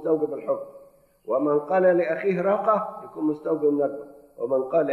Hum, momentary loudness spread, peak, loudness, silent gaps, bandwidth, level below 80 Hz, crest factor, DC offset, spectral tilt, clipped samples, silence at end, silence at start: none; 13 LU; -8 dBFS; -24 LUFS; none; 4.4 kHz; -70 dBFS; 16 dB; under 0.1%; -9 dB/octave; under 0.1%; 0 s; 0 s